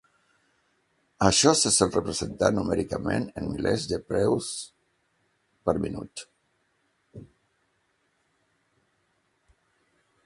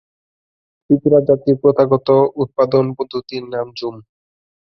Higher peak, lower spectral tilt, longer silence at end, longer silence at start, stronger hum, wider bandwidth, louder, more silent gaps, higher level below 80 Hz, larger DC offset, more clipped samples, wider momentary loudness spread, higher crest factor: about the same, -2 dBFS vs -2 dBFS; second, -3.5 dB/octave vs -9.5 dB/octave; first, 3 s vs 0.75 s; first, 1.2 s vs 0.9 s; neither; first, 11.5 kHz vs 6 kHz; second, -25 LUFS vs -16 LUFS; neither; first, -50 dBFS vs -56 dBFS; neither; neither; first, 16 LU vs 12 LU; first, 26 dB vs 16 dB